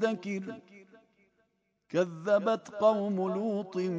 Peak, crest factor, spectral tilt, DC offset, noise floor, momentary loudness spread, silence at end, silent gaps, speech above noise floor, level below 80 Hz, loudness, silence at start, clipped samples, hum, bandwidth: -12 dBFS; 18 dB; -7 dB/octave; under 0.1%; -76 dBFS; 11 LU; 0 s; none; 46 dB; -82 dBFS; -30 LUFS; 0 s; under 0.1%; none; 8 kHz